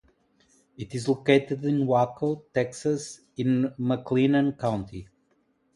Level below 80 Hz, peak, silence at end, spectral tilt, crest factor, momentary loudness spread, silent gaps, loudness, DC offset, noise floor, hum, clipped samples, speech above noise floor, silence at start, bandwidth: -60 dBFS; -6 dBFS; 0.7 s; -6.5 dB/octave; 20 dB; 13 LU; none; -26 LUFS; under 0.1%; -69 dBFS; none; under 0.1%; 43 dB; 0.8 s; 11.5 kHz